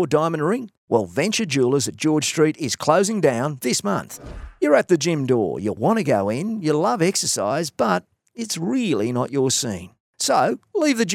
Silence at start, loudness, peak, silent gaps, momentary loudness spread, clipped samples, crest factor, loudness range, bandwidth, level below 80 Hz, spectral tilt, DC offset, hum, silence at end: 0 s; -21 LUFS; -2 dBFS; 0.78-0.88 s, 10.00-10.13 s; 7 LU; under 0.1%; 20 dB; 2 LU; 17 kHz; -52 dBFS; -4.5 dB/octave; under 0.1%; none; 0 s